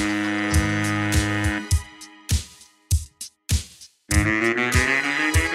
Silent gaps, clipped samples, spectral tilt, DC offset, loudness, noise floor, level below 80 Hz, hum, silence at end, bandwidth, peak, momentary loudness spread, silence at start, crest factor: none; under 0.1%; -4.5 dB/octave; under 0.1%; -22 LUFS; -45 dBFS; -30 dBFS; none; 0 s; 16 kHz; -4 dBFS; 17 LU; 0 s; 20 dB